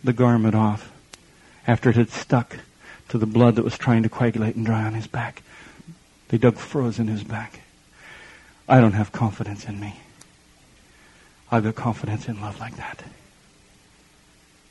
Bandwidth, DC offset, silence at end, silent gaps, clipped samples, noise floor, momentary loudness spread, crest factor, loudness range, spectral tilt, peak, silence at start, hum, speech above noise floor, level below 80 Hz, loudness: 11 kHz; under 0.1%; 1.6 s; none; under 0.1%; -55 dBFS; 19 LU; 22 dB; 8 LU; -8 dB/octave; 0 dBFS; 0.05 s; none; 34 dB; -54 dBFS; -22 LUFS